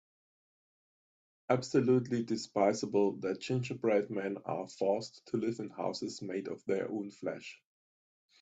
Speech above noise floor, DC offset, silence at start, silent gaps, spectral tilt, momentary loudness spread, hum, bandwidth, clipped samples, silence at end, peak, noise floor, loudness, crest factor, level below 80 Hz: over 57 dB; under 0.1%; 1.5 s; none; -6 dB/octave; 10 LU; none; 8.4 kHz; under 0.1%; 0.85 s; -14 dBFS; under -90 dBFS; -34 LUFS; 20 dB; -76 dBFS